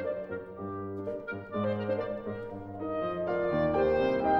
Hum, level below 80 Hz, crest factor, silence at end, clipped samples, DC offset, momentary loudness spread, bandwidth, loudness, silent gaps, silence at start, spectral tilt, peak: none; -54 dBFS; 16 dB; 0 s; under 0.1%; under 0.1%; 12 LU; 6.2 kHz; -32 LUFS; none; 0 s; -9 dB/octave; -16 dBFS